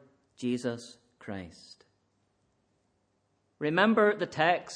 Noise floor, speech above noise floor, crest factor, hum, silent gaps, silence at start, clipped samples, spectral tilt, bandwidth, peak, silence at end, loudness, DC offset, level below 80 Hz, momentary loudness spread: -74 dBFS; 46 dB; 22 dB; none; none; 0.4 s; under 0.1%; -5.5 dB/octave; 10 kHz; -10 dBFS; 0 s; -28 LUFS; under 0.1%; -74 dBFS; 22 LU